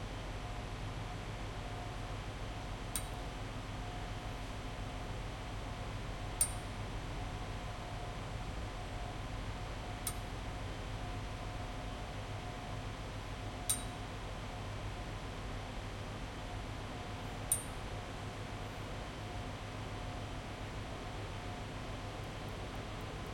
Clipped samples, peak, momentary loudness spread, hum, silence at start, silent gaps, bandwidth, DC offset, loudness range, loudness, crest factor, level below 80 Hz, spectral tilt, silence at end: under 0.1%; -14 dBFS; 6 LU; none; 0 s; none; 16 kHz; under 0.1%; 3 LU; -43 LUFS; 28 dB; -48 dBFS; -4 dB/octave; 0 s